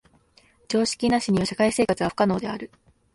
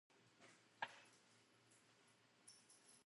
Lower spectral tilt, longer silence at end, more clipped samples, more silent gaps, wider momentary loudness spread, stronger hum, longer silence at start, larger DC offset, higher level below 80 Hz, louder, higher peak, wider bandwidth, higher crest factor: first, -5 dB/octave vs -1.5 dB/octave; first, 0.5 s vs 0 s; neither; neither; second, 10 LU vs 15 LU; neither; first, 0.7 s vs 0.1 s; neither; first, -52 dBFS vs under -90 dBFS; first, -23 LUFS vs -59 LUFS; first, -6 dBFS vs -32 dBFS; about the same, 11.5 kHz vs 11.5 kHz; second, 18 dB vs 30 dB